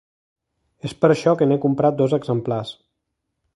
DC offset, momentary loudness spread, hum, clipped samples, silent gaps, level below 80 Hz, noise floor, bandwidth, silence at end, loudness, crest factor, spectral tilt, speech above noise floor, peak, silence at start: under 0.1%; 15 LU; none; under 0.1%; none; -60 dBFS; -77 dBFS; 11.5 kHz; 0.85 s; -19 LUFS; 20 dB; -7.5 dB/octave; 59 dB; 0 dBFS; 0.85 s